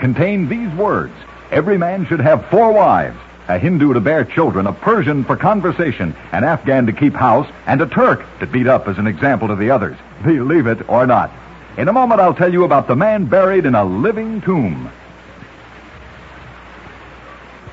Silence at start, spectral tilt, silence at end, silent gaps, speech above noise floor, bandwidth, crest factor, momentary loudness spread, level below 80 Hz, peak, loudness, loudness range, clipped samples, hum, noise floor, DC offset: 0 s; -9.5 dB/octave; 0 s; none; 24 dB; 7.6 kHz; 14 dB; 8 LU; -44 dBFS; 0 dBFS; -15 LUFS; 4 LU; under 0.1%; none; -38 dBFS; under 0.1%